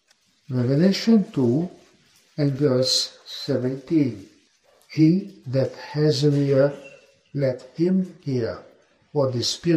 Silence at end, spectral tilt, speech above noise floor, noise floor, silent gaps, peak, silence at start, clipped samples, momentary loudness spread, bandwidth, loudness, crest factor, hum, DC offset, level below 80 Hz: 0 s; -6 dB/octave; 38 dB; -60 dBFS; none; -6 dBFS; 0.5 s; under 0.1%; 12 LU; 14 kHz; -22 LUFS; 18 dB; none; under 0.1%; -64 dBFS